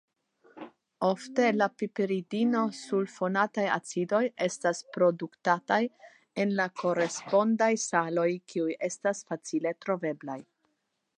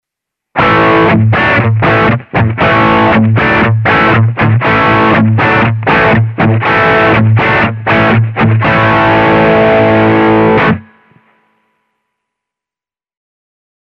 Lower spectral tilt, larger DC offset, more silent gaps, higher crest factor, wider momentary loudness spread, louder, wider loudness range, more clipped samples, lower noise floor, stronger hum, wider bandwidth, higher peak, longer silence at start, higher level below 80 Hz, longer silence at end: second, -5 dB/octave vs -8.5 dB/octave; neither; neither; first, 20 dB vs 8 dB; first, 9 LU vs 3 LU; second, -29 LUFS vs -8 LUFS; about the same, 2 LU vs 4 LU; neither; second, -79 dBFS vs -90 dBFS; neither; first, 11 kHz vs 6 kHz; second, -10 dBFS vs 0 dBFS; about the same, 0.55 s vs 0.55 s; second, -84 dBFS vs -34 dBFS; second, 0.75 s vs 3.05 s